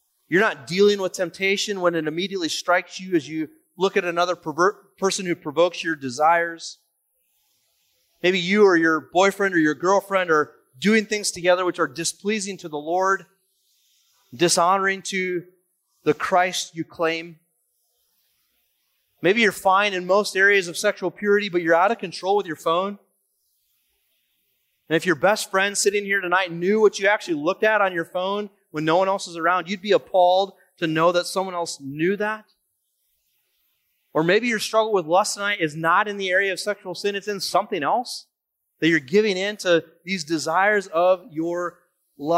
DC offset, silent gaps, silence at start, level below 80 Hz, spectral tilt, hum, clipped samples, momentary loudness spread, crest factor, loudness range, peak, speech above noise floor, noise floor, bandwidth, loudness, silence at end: under 0.1%; none; 0.3 s; -72 dBFS; -3.5 dB/octave; none; under 0.1%; 9 LU; 16 dB; 5 LU; -6 dBFS; 57 dB; -78 dBFS; 16 kHz; -21 LUFS; 0 s